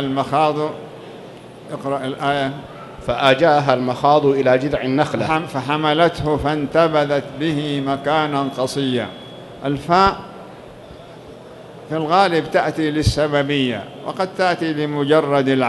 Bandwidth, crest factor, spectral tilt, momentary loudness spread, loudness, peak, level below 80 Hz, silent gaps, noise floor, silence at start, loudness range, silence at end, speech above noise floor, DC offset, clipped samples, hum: 12 kHz; 18 dB; -6 dB/octave; 22 LU; -18 LUFS; 0 dBFS; -42 dBFS; none; -38 dBFS; 0 s; 5 LU; 0 s; 20 dB; under 0.1%; under 0.1%; none